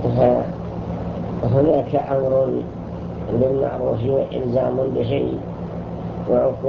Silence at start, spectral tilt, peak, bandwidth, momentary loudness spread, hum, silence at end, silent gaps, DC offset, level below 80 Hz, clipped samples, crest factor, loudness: 0 s; -10.5 dB/octave; -4 dBFS; 6.4 kHz; 12 LU; none; 0 s; none; under 0.1%; -40 dBFS; under 0.1%; 18 dB; -21 LUFS